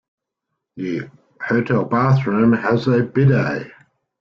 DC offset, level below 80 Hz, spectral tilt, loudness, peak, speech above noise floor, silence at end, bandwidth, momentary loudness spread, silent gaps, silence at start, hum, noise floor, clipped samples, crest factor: under 0.1%; -54 dBFS; -9 dB/octave; -18 LUFS; -4 dBFS; 62 dB; 0.5 s; 6.4 kHz; 14 LU; none; 0.75 s; none; -79 dBFS; under 0.1%; 14 dB